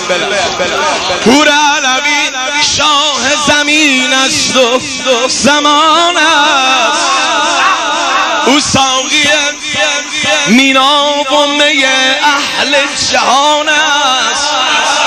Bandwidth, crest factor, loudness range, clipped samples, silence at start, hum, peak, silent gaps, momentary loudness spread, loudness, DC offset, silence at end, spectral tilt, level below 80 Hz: 16 kHz; 10 dB; 1 LU; 0.2%; 0 s; none; 0 dBFS; none; 4 LU; -8 LUFS; 0.2%; 0 s; -1 dB/octave; -44 dBFS